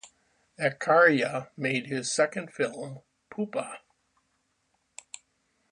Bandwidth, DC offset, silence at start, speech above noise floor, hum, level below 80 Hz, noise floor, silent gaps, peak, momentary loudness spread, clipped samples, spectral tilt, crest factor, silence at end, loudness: 11 kHz; under 0.1%; 0.05 s; 47 dB; none; -76 dBFS; -74 dBFS; none; -8 dBFS; 24 LU; under 0.1%; -4 dB/octave; 22 dB; 1.95 s; -27 LUFS